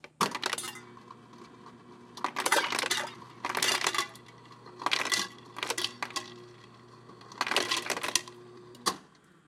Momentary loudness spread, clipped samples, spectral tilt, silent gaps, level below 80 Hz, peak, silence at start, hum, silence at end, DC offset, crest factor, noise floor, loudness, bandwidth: 24 LU; under 0.1%; -0.5 dB/octave; none; -78 dBFS; -6 dBFS; 0.05 s; none; 0.45 s; under 0.1%; 28 dB; -58 dBFS; -31 LUFS; 16.5 kHz